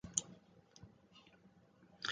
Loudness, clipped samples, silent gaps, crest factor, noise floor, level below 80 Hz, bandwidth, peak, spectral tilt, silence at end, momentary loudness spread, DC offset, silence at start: -42 LUFS; under 0.1%; none; 34 dB; -67 dBFS; -72 dBFS; 9 kHz; -16 dBFS; -0.5 dB/octave; 0 s; 27 LU; under 0.1%; 0.05 s